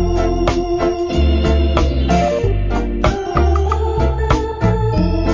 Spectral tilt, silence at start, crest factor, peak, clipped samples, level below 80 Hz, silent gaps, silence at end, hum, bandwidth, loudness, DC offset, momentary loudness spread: -7.5 dB/octave; 0 s; 14 dB; 0 dBFS; under 0.1%; -18 dBFS; none; 0 s; none; 7.6 kHz; -17 LUFS; under 0.1%; 3 LU